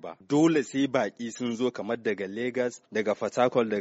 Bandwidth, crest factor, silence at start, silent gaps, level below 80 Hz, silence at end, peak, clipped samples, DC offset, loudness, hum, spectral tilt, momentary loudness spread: 8 kHz; 18 dB; 0.05 s; none; -72 dBFS; 0 s; -10 dBFS; under 0.1%; under 0.1%; -28 LUFS; none; -4.5 dB/octave; 8 LU